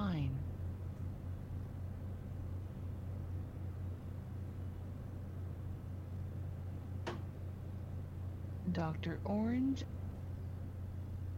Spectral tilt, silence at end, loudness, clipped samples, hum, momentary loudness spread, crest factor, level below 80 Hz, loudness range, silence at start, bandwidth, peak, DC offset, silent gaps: -8.5 dB/octave; 0 s; -43 LUFS; under 0.1%; none; 8 LU; 16 dB; -56 dBFS; 5 LU; 0 s; 15.5 kHz; -24 dBFS; under 0.1%; none